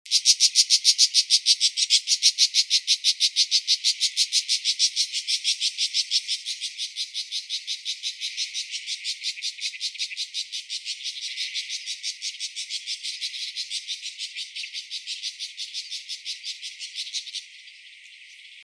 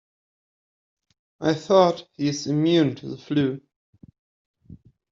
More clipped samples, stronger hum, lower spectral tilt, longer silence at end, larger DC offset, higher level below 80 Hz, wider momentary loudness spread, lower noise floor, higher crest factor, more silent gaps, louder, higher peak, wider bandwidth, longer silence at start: neither; neither; second, 14 dB/octave vs -6 dB/octave; second, 0 s vs 0.35 s; neither; second, under -90 dBFS vs -64 dBFS; first, 15 LU vs 9 LU; about the same, -47 dBFS vs -49 dBFS; about the same, 24 dB vs 22 dB; second, none vs 3.76-3.93 s, 4.19-4.54 s; about the same, -23 LUFS vs -22 LUFS; about the same, -4 dBFS vs -4 dBFS; first, 11 kHz vs 7.6 kHz; second, 0.05 s vs 1.4 s